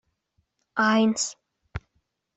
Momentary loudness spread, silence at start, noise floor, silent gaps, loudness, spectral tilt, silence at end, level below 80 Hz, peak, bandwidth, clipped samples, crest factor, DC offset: 20 LU; 0.75 s; -74 dBFS; none; -24 LUFS; -3.5 dB/octave; 0.6 s; -54 dBFS; -8 dBFS; 8.2 kHz; under 0.1%; 20 dB; under 0.1%